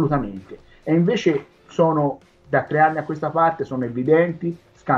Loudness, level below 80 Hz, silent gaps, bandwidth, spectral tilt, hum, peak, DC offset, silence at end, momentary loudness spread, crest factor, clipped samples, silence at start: -21 LUFS; -50 dBFS; none; 7.4 kHz; -8 dB/octave; none; -4 dBFS; under 0.1%; 0 s; 14 LU; 16 dB; under 0.1%; 0 s